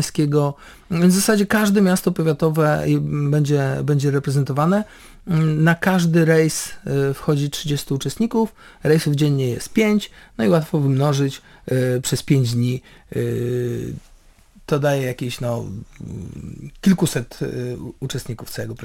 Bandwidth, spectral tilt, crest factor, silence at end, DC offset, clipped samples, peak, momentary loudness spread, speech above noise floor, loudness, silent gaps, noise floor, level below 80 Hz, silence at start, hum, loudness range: 17 kHz; -6 dB/octave; 16 dB; 0 s; under 0.1%; under 0.1%; -4 dBFS; 13 LU; 30 dB; -20 LUFS; none; -49 dBFS; -48 dBFS; 0 s; none; 6 LU